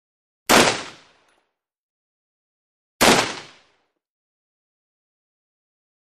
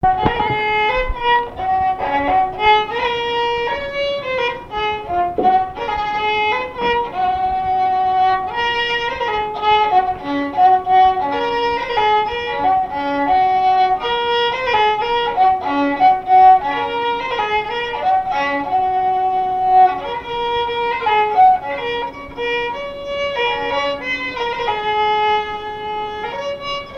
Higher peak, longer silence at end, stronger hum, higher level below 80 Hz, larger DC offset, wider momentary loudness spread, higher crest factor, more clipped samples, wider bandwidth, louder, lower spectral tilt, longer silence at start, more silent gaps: about the same, -2 dBFS vs -2 dBFS; first, 2.75 s vs 0 s; neither; second, -52 dBFS vs -40 dBFS; neither; first, 19 LU vs 9 LU; first, 24 dB vs 16 dB; neither; first, 14 kHz vs 6.6 kHz; about the same, -17 LUFS vs -17 LUFS; second, -2 dB/octave vs -5 dB/octave; first, 0.5 s vs 0 s; first, 1.78-3.00 s vs none